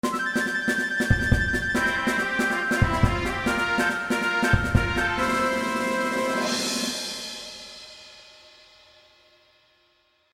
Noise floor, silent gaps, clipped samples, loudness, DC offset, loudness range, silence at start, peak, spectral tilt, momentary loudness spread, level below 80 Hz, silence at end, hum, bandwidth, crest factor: -65 dBFS; none; under 0.1%; -24 LUFS; under 0.1%; 9 LU; 0.05 s; -4 dBFS; -4.5 dB/octave; 12 LU; -36 dBFS; 2.1 s; none; 16 kHz; 22 dB